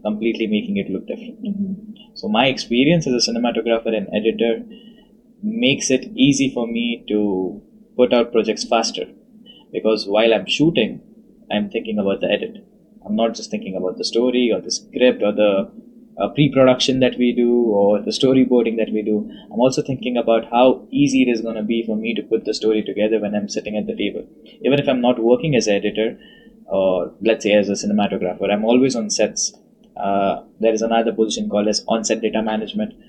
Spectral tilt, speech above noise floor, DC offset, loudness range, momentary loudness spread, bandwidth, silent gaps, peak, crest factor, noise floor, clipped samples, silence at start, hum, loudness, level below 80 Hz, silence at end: -4.5 dB/octave; 31 dB; under 0.1%; 4 LU; 10 LU; 10 kHz; none; -2 dBFS; 18 dB; -49 dBFS; under 0.1%; 0.05 s; none; -19 LUFS; -54 dBFS; 0.2 s